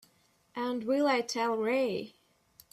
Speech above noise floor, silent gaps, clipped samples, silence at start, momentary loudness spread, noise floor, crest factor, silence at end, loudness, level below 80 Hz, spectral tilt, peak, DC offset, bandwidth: 39 dB; none; under 0.1%; 0.55 s; 13 LU; -69 dBFS; 16 dB; 0.65 s; -31 LUFS; -76 dBFS; -4 dB/octave; -16 dBFS; under 0.1%; 15 kHz